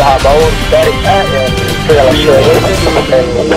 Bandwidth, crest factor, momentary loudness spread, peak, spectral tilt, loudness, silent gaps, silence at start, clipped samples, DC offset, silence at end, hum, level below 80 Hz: 16.5 kHz; 8 dB; 4 LU; 0 dBFS; -5 dB/octave; -8 LUFS; none; 0 s; 0.7%; under 0.1%; 0 s; none; -20 dBFS